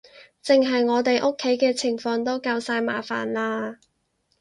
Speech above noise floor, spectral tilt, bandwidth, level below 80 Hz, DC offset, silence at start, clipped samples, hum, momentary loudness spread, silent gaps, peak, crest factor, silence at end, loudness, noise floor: 48 dB; -3.5 dB/octave; 11.5 kHz; -68 dBFS; under 0.1%; 0.15 s; under 0.1%; none; 7 LU; none; -6 dBFS; 18 dB; 0.65 s; -23 LUFS; -71 dBFS